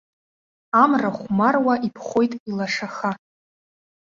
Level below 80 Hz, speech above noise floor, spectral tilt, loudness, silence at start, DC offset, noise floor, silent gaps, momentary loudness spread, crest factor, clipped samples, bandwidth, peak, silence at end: -64 dBFS; over 69 dB; -6 dB/octave; -21 LUFS; 0.75 s; under 0.1%; under -90 dBFS; 2.40-2.46 s; 10 LU; 20 dB; under 0.1%; 7.6 kHz; -2 dBFS; 0.9 s